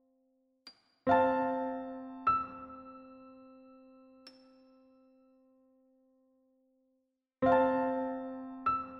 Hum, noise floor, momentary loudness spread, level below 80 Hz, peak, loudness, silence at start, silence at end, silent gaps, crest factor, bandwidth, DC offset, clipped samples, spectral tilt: none; -81 dBFS; 24 LU; -68 dBFS; -14 dBFS; -32 LUFS; 0.65 s; 0 s; none; 22 dB; 5.8 kHz; under 0.1%; under 0.1%; -8 dB/octave